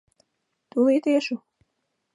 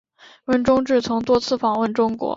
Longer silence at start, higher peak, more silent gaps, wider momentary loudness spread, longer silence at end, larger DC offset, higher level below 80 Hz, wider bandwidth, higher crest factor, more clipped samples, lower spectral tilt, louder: first, 0.75 s vs 0.5 s; second, -10 dBFS vs -4 dBFS; neither; first, 12 LU vs 4 LU; first, 0.8 s vs 0 s; neither; second, -80 dBFS vs -50 dBFS; first, 11.5 kHz vs 7.8 kHz; about the same, 16 dB vs 16 dB; neither; about the same, -5 dB/octave vs -5.5 dB/octave; second, -23 LUFS vs -20 LUFS